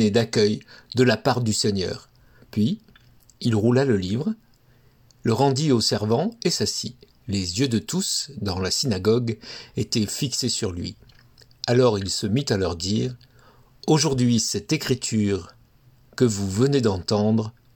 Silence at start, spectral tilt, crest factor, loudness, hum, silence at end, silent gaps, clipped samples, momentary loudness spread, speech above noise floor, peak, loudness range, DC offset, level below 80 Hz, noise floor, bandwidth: 0 s; -5 dB/octave; 18 dB; -23 LUFS; none; 0.25 s; none; under 0.1%; 11 LU; 34 dB; -6 dBFS; 2 LU; under 0.1%; -56 dBFS; -57 dBFS; 18 kHz